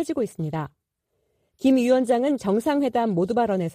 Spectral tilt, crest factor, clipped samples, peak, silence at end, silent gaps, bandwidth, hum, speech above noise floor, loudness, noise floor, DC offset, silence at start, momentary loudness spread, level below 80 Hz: -7 dB/octave; 16 dB; under 0.1%; -8 dBFS; 0 s; none; 15 kHz; none; 53 dB; -23 LUFS; -75 dBFS; under 0.1%; 0 s; 10 LU; -60 dBFS